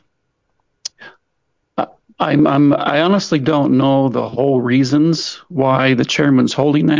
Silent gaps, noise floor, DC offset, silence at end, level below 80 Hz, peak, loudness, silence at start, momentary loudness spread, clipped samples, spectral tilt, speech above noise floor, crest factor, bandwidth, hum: none; -69 dBFS; under 0.1%; 0 s; -54 dBFS; -2 dBFS; -15 LUFS; 1 s; 12 LU; under 0.1%; -6 dB/octave; 56 dB; 14 dB; 7.6 kHz; none